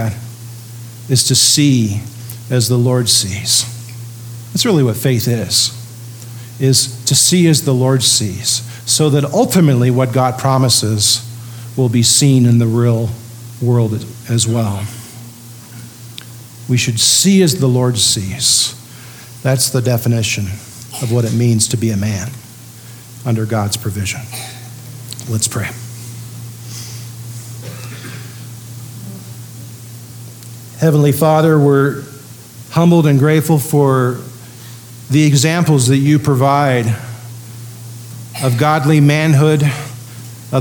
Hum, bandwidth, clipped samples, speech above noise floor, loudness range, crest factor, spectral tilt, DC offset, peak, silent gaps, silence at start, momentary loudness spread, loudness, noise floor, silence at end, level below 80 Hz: none; 19.5 kHz; under 0.1%; 23 dB; 11 LU; 14 dB; -4.5 dB/octave; under 0.1%; 0 dBFS; none; 0 s; 21 LU; -13 LUFS; -35 dBFS; 0 s; -54 dBFS